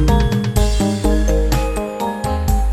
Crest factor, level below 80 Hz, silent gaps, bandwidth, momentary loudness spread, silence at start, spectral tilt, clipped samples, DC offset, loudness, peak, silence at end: 12 dB; -18 dBFS; none; 15 kHz; 5 LU; 0 s; -6 dB/octave; under 0.1%; under 0.1%; -18 LUFS; -2 dBFS; 0 s